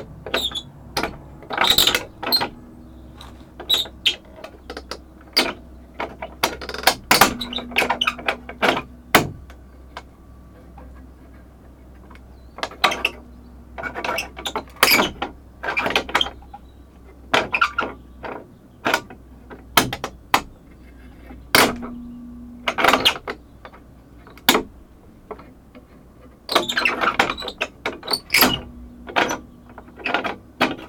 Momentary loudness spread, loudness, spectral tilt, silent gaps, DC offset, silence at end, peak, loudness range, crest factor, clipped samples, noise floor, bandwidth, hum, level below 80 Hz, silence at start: 24 LU; -20 LUFS; -2 dB/octave; none; under 0.1%; 0 s; 0 dBFS; 6 LU; 24 dB; under 0.1%; -46 dBFS; over 20 kHz; none; -44 dBFS; 0 s